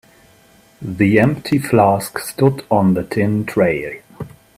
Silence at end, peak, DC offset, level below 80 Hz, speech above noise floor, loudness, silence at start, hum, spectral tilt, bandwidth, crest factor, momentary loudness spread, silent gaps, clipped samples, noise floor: 0.3 s; 0 dBFS; under 0.1%; -50 dBFS; 34 dB; -16 LUFS; 0.8 s; none; -7 dB/octave; 16 kHz; 16 dB; 17 LU; none; under 0.1%; -50 dBFS